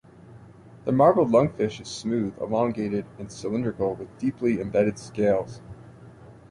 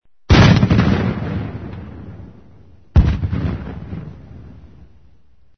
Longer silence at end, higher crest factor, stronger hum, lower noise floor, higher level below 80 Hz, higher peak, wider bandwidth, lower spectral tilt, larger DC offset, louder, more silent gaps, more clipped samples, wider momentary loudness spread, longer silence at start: second, 0.15 s vs 1.1 s; about the same, 18 dB vs 18 dB; neither; second, -48 dBFS vs -53 dBFS; second, -56 dBFS vs -26 dBFS; second, -6 dBFS vs 0 dBFS; first, 11.5 kHz vs 6.6 kHz; about the same, -7 dB/octave vs -7 dB/octave; second, under 0.1% vs 0.5%; second, -25 LUFS vs -16 LUFS; neither; neither; second, 15 LU vs 24 LU; about the same, 0.25 s vs 0.3 s